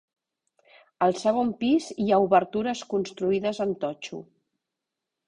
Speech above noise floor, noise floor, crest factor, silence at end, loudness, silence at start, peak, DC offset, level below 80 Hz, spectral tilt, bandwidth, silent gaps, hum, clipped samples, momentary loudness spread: 61 dB; -86 dBFS; 20 dB; 1.05 s; -25 LUFS; 1 s; -6 dBFS; under 0.1%; -66 dBFS; -5.5 dB/octave; 10.5 kHz; none; none; under 0.1%; 10 LU